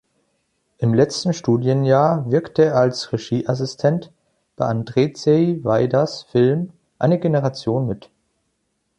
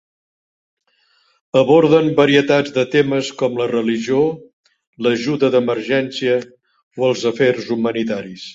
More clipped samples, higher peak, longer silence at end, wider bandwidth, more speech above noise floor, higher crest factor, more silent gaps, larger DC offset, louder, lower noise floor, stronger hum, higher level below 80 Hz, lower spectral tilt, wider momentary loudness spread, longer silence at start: neither; about the same, -2 dBFS vs -2 dBFS; first, 1 s vs 0 s; first, 9.8 kHz vs 7.8 kHz; first, 53 dB vs 44 dB; about the same, 16 dB vs 16 dB; second, none vs 4.53-4.64 s, 4.87-4.93 s, 6.83-6.91 s; neither; about the same, -19 LUFS vs -17 LUFS; first, -71 dBFS vs -60 dBFS; neither; about the same, -56 dBFS vs -60 dBFS; about the same, -7 dB/octave vs -6 dB/octave; about the same, 8 LU vs 8 LU; second, 0.8 s vs 1.55 s